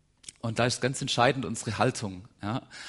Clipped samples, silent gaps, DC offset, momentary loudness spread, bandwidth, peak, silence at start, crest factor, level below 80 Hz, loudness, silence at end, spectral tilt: under 0.1%; none; under 0.1%; 14 LU; 11.5 kHz; -6 dBFS; 0.25 s; 22 dB; -60 dBFS; -29 LUFS; 0 s; -4.5 dB/octave